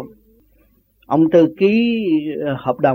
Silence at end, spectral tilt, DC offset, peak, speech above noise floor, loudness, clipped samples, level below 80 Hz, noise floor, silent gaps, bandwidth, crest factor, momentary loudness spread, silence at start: 0 s; -8.5 dB/octave; under 0.1%; -2 dBFS; 41 dB; -16 LUFS; under 0.1%; -56 dBFS; -56 dBFS; none; 6.2 kHz; 16 dB; 9 LU; 0 s